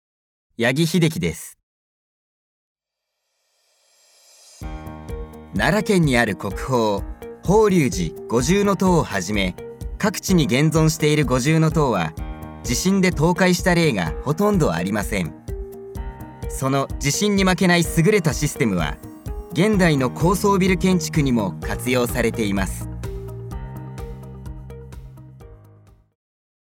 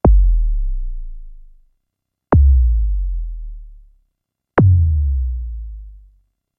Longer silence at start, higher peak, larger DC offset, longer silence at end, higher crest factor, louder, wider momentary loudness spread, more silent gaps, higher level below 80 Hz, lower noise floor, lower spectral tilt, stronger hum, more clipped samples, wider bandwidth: first, 0.6 s vs 0.05 s; about the same, -2 dBFS vs -2 dBFS; neither; first, 1.1 s vs 0.6 s; about the same, 18 dB vs 14 dB; second, -20 LUFS vs -17 LUFS; second, 17 LU vs 22 LU; first, 1.63-2.75 s vs none; second, -36 dBFS vs -18 dBFS; about the same, -80 dBFS vs -78 dBFS; second, -5.5 dB/octave vs -12.5 dB/octave; neither; neither; first, 18 kHz vs 2.9 kHz